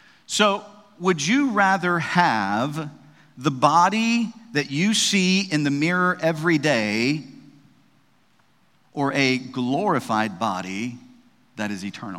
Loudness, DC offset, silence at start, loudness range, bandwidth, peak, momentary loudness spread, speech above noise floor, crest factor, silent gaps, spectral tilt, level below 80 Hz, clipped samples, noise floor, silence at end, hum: -22 LUFS; under 0.1%; 0.3 s; 5 LU; 15.5 kHz; -2 dBFS; 12 LU; 41 dB; 22 dB; none; -4 dB/octave; -72 dBFS; under 0.1%; -62 dBFS; 0 s; none